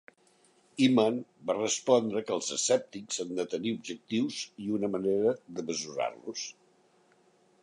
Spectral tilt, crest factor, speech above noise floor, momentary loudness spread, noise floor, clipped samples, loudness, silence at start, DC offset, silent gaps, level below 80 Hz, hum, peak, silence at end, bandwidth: -4 dB/octave; 20 dB; 35 dB; 11 LU; -65 dBFS; under 0.1%; -30 LUFS; 0.75 s; under 0.1%; none; -76 dBFS; none; -10 dBFS; 1.1 s; 11.5 kHz